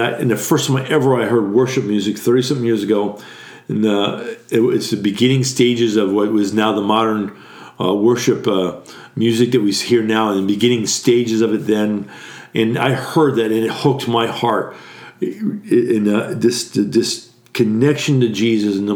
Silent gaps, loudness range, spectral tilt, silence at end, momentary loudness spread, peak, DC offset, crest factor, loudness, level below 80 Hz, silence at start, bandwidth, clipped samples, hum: none; 2 LU; -5 dB/octave; 0 s; 10 LU; -2 dBFS; under 0.1%; 16 dB; -17 LUFS; -66 dBFS; 0 s; over 20 kHz; under 0.1%; none